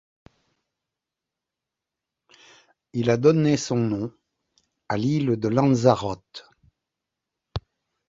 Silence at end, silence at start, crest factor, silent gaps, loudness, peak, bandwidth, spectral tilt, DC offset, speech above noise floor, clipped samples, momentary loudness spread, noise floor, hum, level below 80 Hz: 0.5 s; 2.95 s; 24 dB; none; -22 LUFS; -2 dBFS; 8 kHz; -7 dB/octave; under 0.1%; 65 dB; under 0.1%; 18 LU; -87 dBFS; none; -54 dBFS